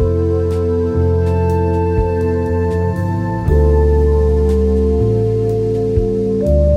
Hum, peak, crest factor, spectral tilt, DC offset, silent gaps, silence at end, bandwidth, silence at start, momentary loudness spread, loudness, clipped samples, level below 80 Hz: none; -2 dBFS; 12 dB; -9.5 dB/octave; under 0.1%; none; 0 s; 7 kHz; 0 s; 4 LU; -15 LUFS; under 0.1%; -20 dBFS